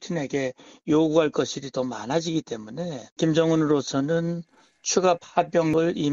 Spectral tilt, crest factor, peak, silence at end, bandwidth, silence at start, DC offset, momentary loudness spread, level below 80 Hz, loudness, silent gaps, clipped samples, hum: -5 dB/octave; 18 dB; -6 dBFS; 0 s; 7.6 kHz; 0 s; under 0.1%; 12 LU; -62 dBFS; -24 LUFS; 3.12-3.16 s; under 0.1%; none